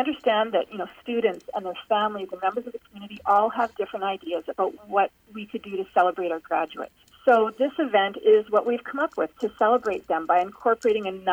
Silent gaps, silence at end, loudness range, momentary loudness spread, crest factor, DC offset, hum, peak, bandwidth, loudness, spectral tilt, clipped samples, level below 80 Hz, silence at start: none; 0 s; 4 LU; 12 LU; 16 dB; under 0.1%; none; -8 dBFS; 8.8 kHz; -25 LUFS; -5.5 dB/octave; under 0.1%; -66 dBFS; 0 s